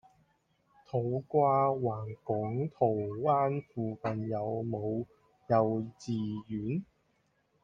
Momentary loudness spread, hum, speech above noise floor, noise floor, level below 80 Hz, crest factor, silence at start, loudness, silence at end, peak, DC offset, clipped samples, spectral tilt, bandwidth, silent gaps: 9 LU; none; 42 dB; -74 dBFS; -68 dBFS; 20 dB; 0.95 s; -32 LUFS; 0.8 s; -14 dBFS; under 0.1%; under 0.1%; -9 dB/octave; 7.6 kHz; none